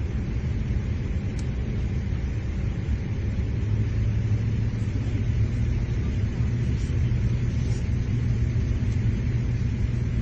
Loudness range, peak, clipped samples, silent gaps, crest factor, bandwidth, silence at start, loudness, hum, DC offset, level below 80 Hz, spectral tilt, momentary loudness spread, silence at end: 3 LU; -12 dBFS; under 0.1%; none; 12 dB; 7.6 kHz; 0 s; -27 LUFS; none; under 0.1%; -30 dBFS; -8 dB/octave; 4 LU; 0 s